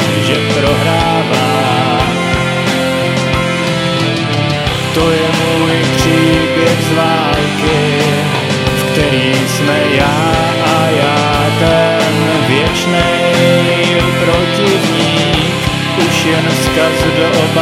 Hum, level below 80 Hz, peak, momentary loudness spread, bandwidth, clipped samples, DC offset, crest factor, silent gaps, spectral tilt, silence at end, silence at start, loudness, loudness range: none; -30 dBFS; 0 dBFS; 3 LU; 16 kHz; under 0.1%; under 0.1%; 12 dB; none; -5 dB/octave; 0 s; 0 s; -11 LUFS; 2 LU